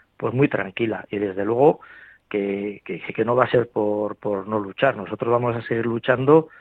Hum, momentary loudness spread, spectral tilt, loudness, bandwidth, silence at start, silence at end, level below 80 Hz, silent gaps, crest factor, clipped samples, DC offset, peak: none; 9 LU; -9.5 dB/octave; -22 LUFS; 4.3 kHz; 0.2 s; 0.1 s; -60 dBFS; none; 20 dB; under 0.1%; under 0.1%; -2 dBFS